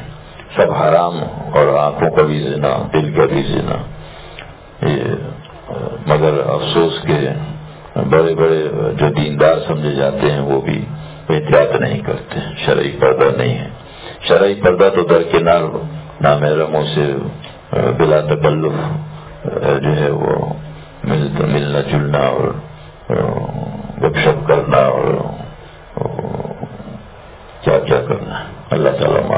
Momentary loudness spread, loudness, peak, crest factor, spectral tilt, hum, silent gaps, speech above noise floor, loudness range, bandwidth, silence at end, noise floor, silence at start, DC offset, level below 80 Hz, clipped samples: 16 LU; -15 LUFS; 0 dBFS; 16 dB; -11 dB/octave; none; none; 22 dB; 5 LU; 4 kHz; 0 s; -36 dBFS; 0 s; under 0.1%; -40 dBFS; under 0.1%